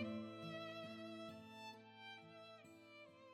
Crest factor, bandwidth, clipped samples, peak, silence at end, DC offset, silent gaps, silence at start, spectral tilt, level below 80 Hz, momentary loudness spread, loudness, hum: 18 dB; 16 kHz; under 0.1%; -34 dBFS; 0 s; under 0.1%; none; 0 s; -5.5 dB/octave; under -90 dBFS; 11 LU; -54 LUFS; none